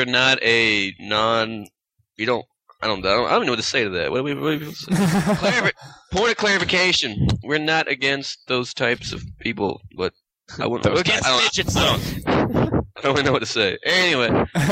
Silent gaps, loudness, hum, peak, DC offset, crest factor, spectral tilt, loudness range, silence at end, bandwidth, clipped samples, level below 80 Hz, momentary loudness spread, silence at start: none; -20 LUFS; none; -4 dBFS; under 0.1%; 18 dB; -4 dB/octave; 3 LU; 0 s; 16 kHz; under 0.1%; -42 dBFS; 11 LU; 0 s